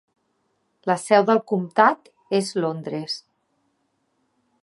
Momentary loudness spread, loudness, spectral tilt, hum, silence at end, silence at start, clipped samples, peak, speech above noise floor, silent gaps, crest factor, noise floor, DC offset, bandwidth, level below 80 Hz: 14 LU; -22 LUFS; -5 dB/octave; none; 1.45 s; 0.85 s; under 0.1%; -2 dBFS; 50 dB; none; 22 dB; -71 dBFS; under 0.1%; 11.5 kHz; -78 dBFS